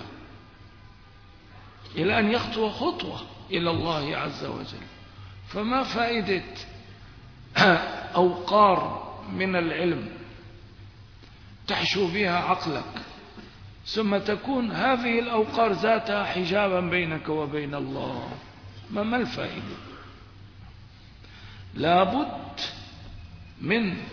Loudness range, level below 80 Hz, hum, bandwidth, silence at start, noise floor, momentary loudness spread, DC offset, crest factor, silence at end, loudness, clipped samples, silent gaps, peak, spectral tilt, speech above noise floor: 7 LU; -52 dBFS; none; 5.4 kHz; 0 s; -50 dBFS; 23 LU; under 0.1%; 22 dB; 0 s; -26 LUFS; under 0.1%; none; -6 dBFS; -6 dB/octave; 25 dB